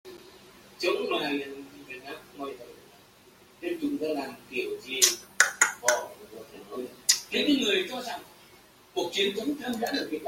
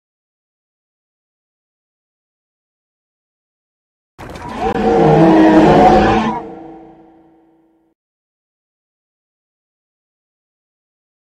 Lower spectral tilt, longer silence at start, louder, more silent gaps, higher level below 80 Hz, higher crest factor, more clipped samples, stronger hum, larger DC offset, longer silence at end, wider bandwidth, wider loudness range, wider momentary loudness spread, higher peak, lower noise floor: second, -1 dB/octave vs -7.5 dB/octave; second, 0.05 s vs 4.2 s; second, -27 LUFS vs -10 LUFS; neither; second, -70 dBFS vs -38 dBFS; first, 28 dB vs 16 dB; neither; neither; neither; second, 0 s vs 4.6 s; first, 16.5 kHz vs 9 kHz; second, 10 LU vs 13 LU; about the same, 20 LU vs 22 LU; about the same, -2 dBFS vs 0 dBFS; about the same, -56 dBFS vs -55 dBFS